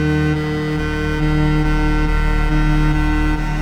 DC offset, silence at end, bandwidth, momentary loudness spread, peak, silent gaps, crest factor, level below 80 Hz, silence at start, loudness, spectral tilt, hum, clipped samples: under 0.1%; 0 s; 10 kHz; 3 LU; -4 dBFS; none; 12 dB; -20 dBFS; 0 s; -18 LUFS; -7 dB/octave; none; under 0.1%